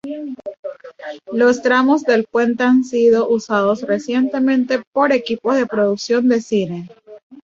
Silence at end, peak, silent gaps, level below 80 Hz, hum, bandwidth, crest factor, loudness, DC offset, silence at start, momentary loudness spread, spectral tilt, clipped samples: 0.1 s; -2 dBFS; 0.59-0.63 s, 4.87-4.92 s, 7.23-7.30 s; -62 dBFS; none; 7.6 kHz; 16 dB; -16 LUFS; under 0.1%; 0.05 s; 17 LU; -5.5 dB/octave; under 0.1%